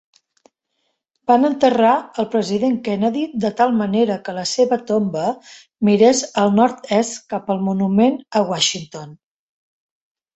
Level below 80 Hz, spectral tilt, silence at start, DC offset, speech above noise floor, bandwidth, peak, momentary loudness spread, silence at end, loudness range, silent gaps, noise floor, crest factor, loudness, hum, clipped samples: -62 dBFS; -5 dB/octave; 1.3 s; under 0.1%; 54 dB; 8.2 kHz; -2 dBFS; 9 LU; 1.2 s; 2 LU; none; -72 dBFS; 16 dB; -18 LUFS; none; under 0.1%